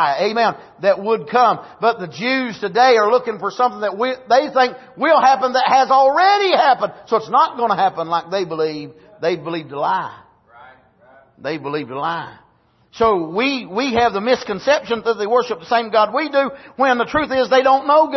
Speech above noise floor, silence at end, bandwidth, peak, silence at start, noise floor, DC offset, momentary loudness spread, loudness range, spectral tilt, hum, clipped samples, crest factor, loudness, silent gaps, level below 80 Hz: 40 dB; 0 s; 6.2 kHz; -2 dBFS; 0 s; -56 dBFS; under 0.1%; 10 LU; 10 LU; -4.5 dB/octave; none; under 0.1%; 14 dB; -17 LUFS; none; -54 dBFS